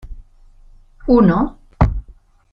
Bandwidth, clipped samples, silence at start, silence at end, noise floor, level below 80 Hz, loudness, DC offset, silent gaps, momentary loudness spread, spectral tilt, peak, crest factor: 5.8 kHz; under 0.1%; 0.05 s; 0.4 s; -45 dBFS; -26 dBFS; -16 LUFS; under 0.1%; none; 15 LU; -10.5 dB/octave; -2 dBFS; 16 dB